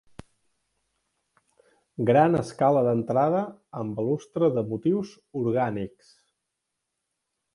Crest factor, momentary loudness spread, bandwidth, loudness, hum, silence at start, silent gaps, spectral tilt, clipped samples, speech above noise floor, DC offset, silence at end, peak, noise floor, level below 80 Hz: 20 dB; 15 LU; 11.5 kHz; -25 LUFS; none; 2 s; none; -8 dB/octave; under 0.1%; 58 dB; under 0.1%; 1.65 s; -6 dBFS; -82 dBFS; -62 dBFS